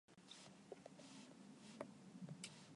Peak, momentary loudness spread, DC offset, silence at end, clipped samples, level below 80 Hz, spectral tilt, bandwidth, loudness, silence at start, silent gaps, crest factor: -32 dBFS; 6 LU; under 0.1%; 0 s; under 0.1%; under -90 dBFS; -4 dB/octave; 11.5 kHz; -59 LUFS; 0.1 s; none; 26 dB